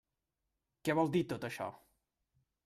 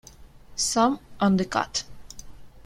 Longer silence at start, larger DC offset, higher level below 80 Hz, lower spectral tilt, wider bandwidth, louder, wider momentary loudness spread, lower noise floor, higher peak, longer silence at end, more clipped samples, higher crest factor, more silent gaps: first, 0.85 s vs 0.2 s; neither; second, -74 dBFS vs -50 dBFS; first, -6.5 dB/octave vs -4 dB/octave; about the same, 15 kHz vs 15.5 kHz; second, -36 LUFS vs -24 LUFS; second, 11 LU vs 23 LU; first, -88 dBFS vs -47 dBFS; second, -20 dBFS vs -8 dBFS; first, 0.9 s vs 0.05 s; neither; about the same, 20 dB vs 20 dB; neither